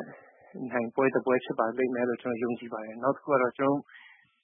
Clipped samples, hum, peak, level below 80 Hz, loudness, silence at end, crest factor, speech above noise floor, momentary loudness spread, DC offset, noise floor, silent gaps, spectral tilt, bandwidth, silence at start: under 0.1%; none; -10 dBFS; -80 dBFS; -29 LUFS; 0.35 s; 20 dB; 22 dB; 11 LU; under 0.1%; -51 dBFS; none; -10.5 dB/octave; 3.7 kHz; 0 s